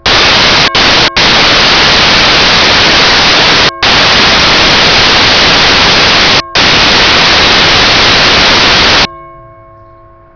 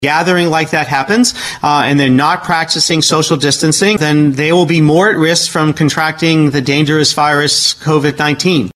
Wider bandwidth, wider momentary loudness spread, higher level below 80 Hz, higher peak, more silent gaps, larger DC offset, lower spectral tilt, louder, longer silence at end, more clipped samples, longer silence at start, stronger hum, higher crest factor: second, 5.4 kHz vs 13 kHz; about the same, 1 LU vs 3 LU; first, -24 dBFS vs -48 dBFS; about the same, 0 dBFS vs 0 dBFS; neither; neither; second, -2 dB/octave vs -4 dB/octave; first, -3 LUFS vs -11 LUFS; first, 1.05 s vs 0.05 s; neither; about the same, 0.05 s vs 0 s; neither; second, 6 dB vs 12 dB